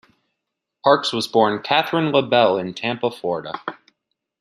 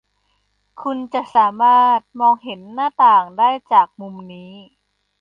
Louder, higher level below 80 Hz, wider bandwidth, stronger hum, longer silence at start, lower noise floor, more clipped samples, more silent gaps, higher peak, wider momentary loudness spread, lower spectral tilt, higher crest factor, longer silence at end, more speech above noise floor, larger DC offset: second, -19 LUFS vs -16 LUFS; about the same, -68 dBFS vs -68 dBFS; first, 14 kHz vs 5.2 kHz; second, none vs 50 Hz at -60 dBFS; about the same, 0.85 s vs 0.8 s; first, -80 dBFS vs -66 dBFS; neither; neither; about the same, -2 dBFS vs -2 dBFS; second, 10 LU vs 18 LU; about the same, -5 dB/octave vs -6 dB/octave; about the same, 20 dB vs 16 dB; about the same, 0.65 s vs 0.6 s; first, 61 dB vs 50 dB; neither